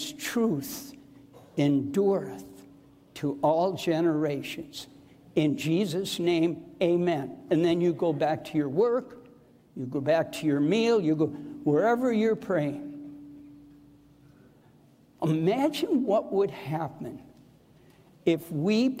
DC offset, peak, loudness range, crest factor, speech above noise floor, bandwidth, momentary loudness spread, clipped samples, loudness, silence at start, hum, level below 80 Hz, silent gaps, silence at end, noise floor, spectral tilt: under 0.1%; -12 dBFS; 4 LU; 16 dB; 32 dB; 16 kHz; 17 LU; under 0.1%; -27 LUFS; 0 s; none; -68 dBFS; none; 0 s; -58 dBFS; -6.5 dB/octave